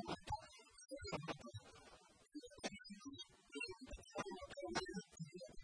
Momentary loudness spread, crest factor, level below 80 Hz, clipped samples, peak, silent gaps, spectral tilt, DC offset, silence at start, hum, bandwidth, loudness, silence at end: 14 LU; 24 dB; -66 dBFS; under 0.1%; -28 dBFS; none; -4 dB/octave; under 0.1%; 0 s; none; 11 kHz; -51 LUFS; 0 s